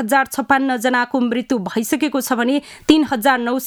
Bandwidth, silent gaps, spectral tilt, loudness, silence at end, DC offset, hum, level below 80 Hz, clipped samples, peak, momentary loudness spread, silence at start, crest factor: 19 kHz; none; -3.5 dB/octave; -18 LUFS; 0 s; under 0.1%; none; -54 dBFS; under 0.1%; 0 dBFS; 5 LU; 0 s; 18 dB